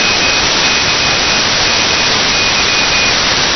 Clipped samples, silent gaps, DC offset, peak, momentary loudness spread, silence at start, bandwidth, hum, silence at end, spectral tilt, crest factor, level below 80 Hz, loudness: under 0.1%; none; under 0.1%; 0 dBFS; 1 LU; 0 s; 6.6 kHz; none; 0 s; -1 dB/octave; 12 dB; -32 dBFS; -9 LUFS